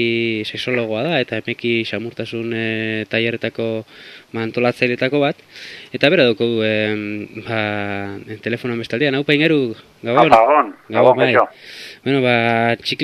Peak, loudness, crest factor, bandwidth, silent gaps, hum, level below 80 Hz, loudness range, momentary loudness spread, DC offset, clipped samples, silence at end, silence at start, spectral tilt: 0 dBFS; -18 LUFS; 18 dB; 13.5 kHz; none; none; -60 dBFS; 6 LU; 14 LU; under 0.1%; under 0.1%; 0 s; 0 s; -6.5 dB/octave